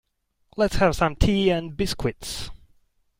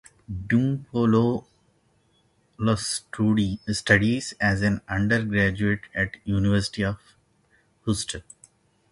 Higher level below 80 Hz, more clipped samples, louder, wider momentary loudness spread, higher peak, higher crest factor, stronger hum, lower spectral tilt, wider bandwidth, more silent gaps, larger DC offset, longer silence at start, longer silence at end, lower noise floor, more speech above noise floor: first, -34 dBFS vs -46 dBFS; neither; about the same, -24 LUFS vs -24 LUFS; first, 13 LU vs 10 LU; about the same, -4 dBFS vs -2 dBFS; about the same, 20 dB vs 24 dB; neither; about the same, -5.5 dB/octave vs -5.5 dB/octave; first, 16.5 kHz vs 11.5 kHz; neither; neither; first, 0.55 s vs 0.3 s; about the same, 0.65 s vs 0.7 s; about the same, -63 dBFS vs -65 dBFS; about the same, 40 dB vs 41 dB